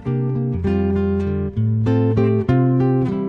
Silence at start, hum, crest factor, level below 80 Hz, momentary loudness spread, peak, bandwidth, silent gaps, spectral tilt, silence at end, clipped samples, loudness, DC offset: 0 s; none; 12 dB; -38 dBFS; 5 LU; -4 dBFS; 5.2 kHz; none; -11 dB/octave; 0 s; under 0.1%; -19 LUFS; under 0.1%